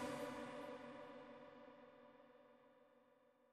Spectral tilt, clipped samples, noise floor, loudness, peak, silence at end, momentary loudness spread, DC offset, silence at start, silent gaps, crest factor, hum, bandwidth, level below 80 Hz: -4.5 dB/octave; under 0.1%; -74 dBFS; -54 LUFS; -36 dBFS; 0 s; 18 LU; under 0.1%; 0 s; none; 20 dB; none; 13 kHz; -86 dBFS